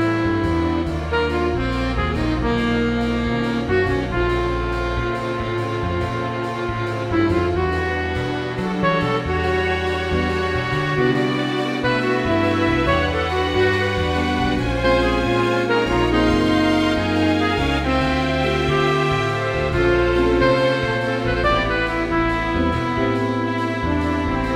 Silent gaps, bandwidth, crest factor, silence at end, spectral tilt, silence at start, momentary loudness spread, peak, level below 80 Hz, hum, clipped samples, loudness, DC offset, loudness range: none; 13.5 kHz; 16 dB; 0 s; -6.5 dB/octave; 0 s; 5 LU; -4 dBFS; -32 dBFS; none; under 0.1%; -20 LUFS; under 0.1%; 4 LU